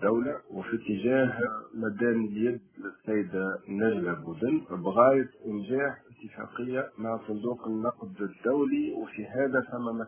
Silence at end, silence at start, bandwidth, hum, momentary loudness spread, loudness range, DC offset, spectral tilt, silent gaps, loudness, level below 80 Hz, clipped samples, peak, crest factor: 0 s; 0 s; 3.5 kHz; none; 11 LU; 4 LU; under 0.1%; -11 dB/octave; none; -30 LUFS; -66 dBFS; under 0.1%; -6 dBFS; 22 dB